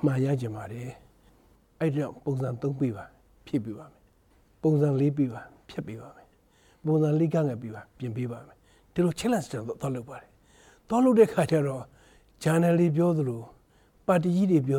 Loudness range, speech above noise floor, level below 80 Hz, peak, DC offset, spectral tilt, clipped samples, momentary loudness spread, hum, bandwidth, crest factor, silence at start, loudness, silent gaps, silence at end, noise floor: 8 LU; 36 dB; -62 dBFS; -8 dBFS; under 0.1%; -8 dB/octave; under 0.1%; 17 LU; none; 16 kHz; 18 dB; 0 s; -27 LUFS; none; 0 s; -62 dBFS